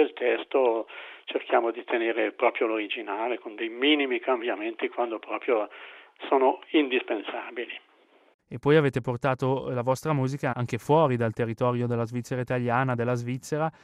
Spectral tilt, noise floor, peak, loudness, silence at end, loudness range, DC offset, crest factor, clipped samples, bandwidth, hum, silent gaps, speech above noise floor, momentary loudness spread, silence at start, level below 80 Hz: -6.5 dB/octave; -61 dBFS; -8 dBFS; -27 LUFS; 0.15 s; 2 LU; under 0.1%; 18 dB; under 0.1%; 14 kHz; none; 8.34-8.39 s; 34 dB; 12 LU; 0 s; -66 dBFS